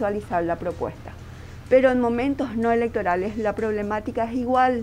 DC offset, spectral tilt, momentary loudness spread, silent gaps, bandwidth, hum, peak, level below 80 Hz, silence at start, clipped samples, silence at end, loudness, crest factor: under 0.1%; -7 dB/octave; 18 LU; none; 10.5 kHz; none; -4 dBFS; -44 dBFS; 0 s; under 0.1%; 0 s; -23 LUFS; 18 dB